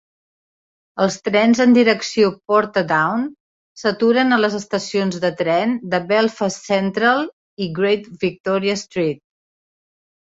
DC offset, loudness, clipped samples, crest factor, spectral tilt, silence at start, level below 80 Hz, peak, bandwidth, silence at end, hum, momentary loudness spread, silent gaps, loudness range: under 0.1%; -18 LUFS; under 0.1%; 18 dB; -5 dB/octave; 0.95 s; -62 dBFS; -2 dBFS; 7.8 kHz; 1.2 s; none; 10 LU; 3.40-3.75 s, 7.33-7.57 s, 8.40-8.44 s; 4 LU